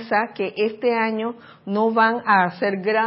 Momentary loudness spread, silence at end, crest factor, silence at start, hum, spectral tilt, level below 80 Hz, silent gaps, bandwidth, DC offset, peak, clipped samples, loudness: 10 LU; 0 s; 18 dB; 0 s; none; -10.5 dB/octave; -76 dBFS; none; 5.8 kHz; under 0.1%; -4 dBFS; under 0.1%; -21 LUFS